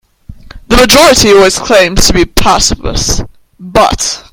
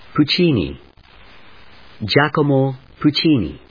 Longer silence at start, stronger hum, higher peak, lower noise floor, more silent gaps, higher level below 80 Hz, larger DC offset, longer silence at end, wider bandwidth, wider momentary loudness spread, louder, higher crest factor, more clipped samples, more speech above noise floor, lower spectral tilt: first, 0.3 s vs 0.15 s; neither; about the same, 0 dBFS vs 0 dBFS; second, -32 dBFS vs -46 dBFS; neither; first, -20 dBFS vs -44 dBFS; second, under 0.1% vs 0.3%; about the same, 0.1 s vs 0.15 s; first, over 20 kHz vs 5.2 kHz; about the same, 10 LU vs 8 LU; first, -7 LUFS vs -17 LUFS; second, 8 dB vs 18 dB; first, 3% vs under 0.1%; second, 25 dB vs 29 dB; second, -3 dB/octave vs -7.5 dB/octave